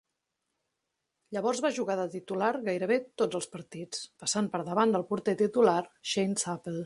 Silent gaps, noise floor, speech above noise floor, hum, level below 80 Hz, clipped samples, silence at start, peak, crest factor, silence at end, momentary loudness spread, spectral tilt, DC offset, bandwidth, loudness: none; -84 dBFS; 54 dB; none; -74 dBFS; under 0.1%; 1.3 s; -12 dBFS; 20 dB; 0 s; 12 LU; -4 dB/octave; under 0.1%; 11.5 kHz; -30 LUFS